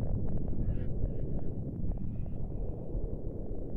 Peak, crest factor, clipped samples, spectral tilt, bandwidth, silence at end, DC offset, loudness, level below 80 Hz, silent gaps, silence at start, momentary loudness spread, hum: -18 dBFS; 14 dB; under 0.1%; -12.5 dB/octave; 1.9 kHz; 0 s; under 0.1%; -38 LUFS; -36 dBFS; none; 0 s; 4 LU; none